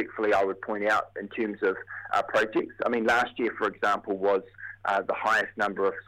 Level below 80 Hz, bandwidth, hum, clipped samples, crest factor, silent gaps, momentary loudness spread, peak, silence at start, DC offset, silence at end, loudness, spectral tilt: -64 dBFS; 15.5 kHz; none; under 0.1%; 16 dB; none; 6 LU; -12 dBFS; 0 s; under 0.1%; 0.05 s; -27 LUFS; -4.5 dB/octave